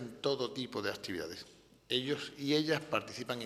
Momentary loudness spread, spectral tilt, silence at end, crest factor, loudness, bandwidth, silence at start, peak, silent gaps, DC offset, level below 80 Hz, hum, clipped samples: 10 LU; -4.5 dB/octave; 0 s; 20 dB; -36 LUFS; 14.5 kHz; 0 s; -16 dBFS; none; under 0.1%; -72 dBFS; none; under 0.1%